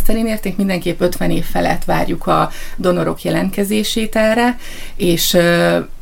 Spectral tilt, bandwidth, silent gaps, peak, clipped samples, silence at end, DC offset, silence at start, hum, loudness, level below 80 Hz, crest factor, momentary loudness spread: -5 dB/octave; 17 kHz; none; 0 dBFS; under 0.1%; 0 s; under 0.1%; 0 s; none; -16 LUFS; -24 dBFS; 14 dB; 7 LU